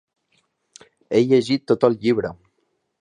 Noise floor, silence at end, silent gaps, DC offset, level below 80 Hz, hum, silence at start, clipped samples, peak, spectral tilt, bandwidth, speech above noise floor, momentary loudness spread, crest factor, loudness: -71 dBFS; 0.65 s; none; under 0.1%; -60 dBFS; none; 1.1 s; under 0.1%; -2 dBFS; -6.5 dB/octave; 10.5 kHz; 52 dB; 6 LU; 20 dB; -19 LUFS